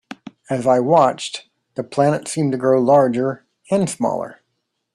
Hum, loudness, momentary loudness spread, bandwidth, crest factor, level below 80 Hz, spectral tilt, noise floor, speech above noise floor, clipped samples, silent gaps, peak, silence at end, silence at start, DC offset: none; -18 LUFS; 19 LU; 12.5 kHz; 18 dB; -62 dBFS; -6 dB/octave; -74 dBFS; 56 dB; under 0.1%; none; -2 dBFS; 0.6 s; 0.1 s; under 0.1%